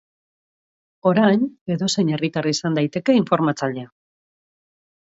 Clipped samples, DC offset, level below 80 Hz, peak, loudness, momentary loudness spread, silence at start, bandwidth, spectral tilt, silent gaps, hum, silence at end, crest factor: under 0.1%; under 0.1%; -66 dBFS; -2 dBFS; -20 LUFS; 7 LU; 1.05 s; 8 kHz; -5.5 dB/octave; 1.61-1.66 s; none; 1.2 s; 20 dB